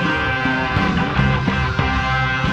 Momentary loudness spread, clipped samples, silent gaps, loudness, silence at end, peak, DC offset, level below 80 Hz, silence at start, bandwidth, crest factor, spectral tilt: 1 LU; under 0.1%; none; -18 LUFS; 0 s; -4 dBFS; 0.3%; -28 dBFS; 0 s; 8.2 kHz; 14 dB; -6.5 dB/octave